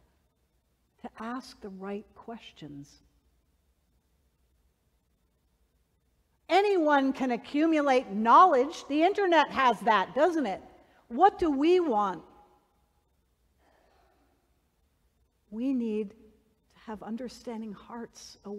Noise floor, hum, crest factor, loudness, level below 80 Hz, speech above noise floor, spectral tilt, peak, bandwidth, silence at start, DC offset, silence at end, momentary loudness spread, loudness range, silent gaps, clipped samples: -73 dBFS; none; 20 dB; -25 LUFS; -66 dBFS; 46 dB; -5 dB/octave; -8 dBFS; 12.5 kHz; 1.05 s; under 0.1%; 0 s; 22 LU; 19 LU; none; under 0.1%